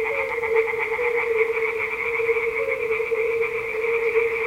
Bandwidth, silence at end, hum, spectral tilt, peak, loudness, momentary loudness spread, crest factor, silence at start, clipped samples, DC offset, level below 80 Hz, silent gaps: 16 kHz; 0 s; none; -4 dB/octave; -8 dBFS; -23 LUFS; 3 LU; 16 dB; 0 s; under 0.1%; under 0.1%; -56 dBFS; none